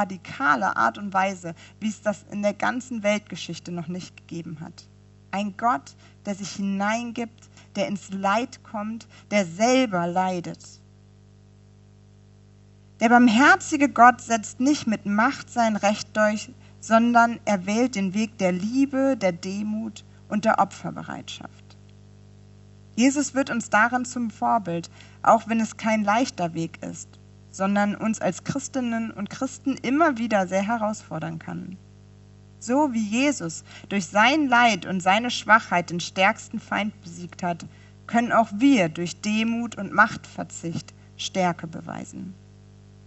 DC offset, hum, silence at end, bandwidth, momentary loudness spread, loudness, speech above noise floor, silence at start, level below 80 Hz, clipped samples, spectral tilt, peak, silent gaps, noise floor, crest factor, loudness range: under 0.1%; 50 Hz at -50 dBFS; 0.7 s; 8.2 kHz; 17 LU; -23 LUFS; 28 dB; 0 s; -62 dBFS; under 0.1%; -4.5 dB/octave; -2 dBFS; none; -52 dBFS; 22 dB; 9 LU